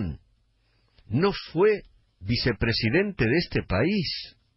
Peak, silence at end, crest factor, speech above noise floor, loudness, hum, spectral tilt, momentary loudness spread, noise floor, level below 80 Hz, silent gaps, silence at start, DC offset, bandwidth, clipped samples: -10 dBFS; 0.25 s; 16 dB; 42 dB; -25 LUFS; none; -9 dB/octave; 10 LU; -66 dBFS; -44 dBFS; none; 0 s; under 0.1%; 5.8 kHz; under 0.1%